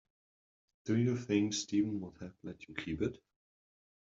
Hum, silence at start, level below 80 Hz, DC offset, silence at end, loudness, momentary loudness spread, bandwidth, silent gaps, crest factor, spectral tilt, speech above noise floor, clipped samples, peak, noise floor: none; 0.85 s; -66 dBFS; under 0.1%; 0.95 s; -35 LUFS; 15 LU; 7.8 kHz; none; 20 dB; -6.5 dB/octave; over 55 dB; under 0.1%; -18 dBFS; under -90 dBFS